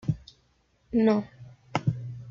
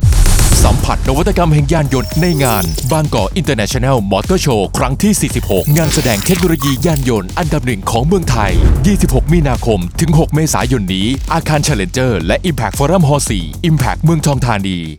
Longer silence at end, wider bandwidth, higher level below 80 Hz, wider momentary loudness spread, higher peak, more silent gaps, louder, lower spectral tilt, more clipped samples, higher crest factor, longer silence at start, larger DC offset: about the same, 0 s vs 0 s; second, 7.2 kHz vs over 20 kHz; second, -56 dBFS vs -18 dBFS; first, 14 LU vs 4 LU; second, -10 dBFS vs 0 dBFS; neither; second, -28 LUFS vs -13 LUFS; first, -8 dB/octave vs -5.5 dB/octave; neither; first, 18 dB vs 12 dB; about the same, 0.05 s vs 0 s; neither